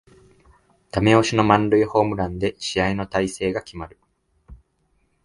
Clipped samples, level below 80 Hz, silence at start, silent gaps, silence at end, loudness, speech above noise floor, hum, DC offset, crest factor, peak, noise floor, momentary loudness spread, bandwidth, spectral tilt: under 0.1%; -46 dBFS; 0.95 s; none; 0.7 s; -20 LUFS; 46 dB; none; under 0.1%; 22 dB; 0 dBFS; -66 dBFS; 13 LU; 11.5 kHz; -5.5 dB/octave